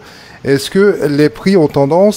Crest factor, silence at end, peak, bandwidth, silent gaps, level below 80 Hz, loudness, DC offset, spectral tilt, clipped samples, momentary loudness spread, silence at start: 12 dB; 0 s; 0 dBFS; 16.5 kHz; none; -46 dBFS; -12 LUFS; under 0.1%; -6.5 dB/octave; under 0.1%; 5 LU; 0.45 s